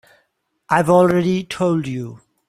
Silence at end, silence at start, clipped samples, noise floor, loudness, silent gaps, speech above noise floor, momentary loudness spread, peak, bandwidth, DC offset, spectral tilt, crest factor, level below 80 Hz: 0.3 s; 0.7 s; under 0.1%; -68 dBFS; -17 LUFS; none; 51 dB; 14 LU; 0 dBFS; 14.5 kHz; under 0.1%; -7 dB/octave; 18 dB; -54 dBFS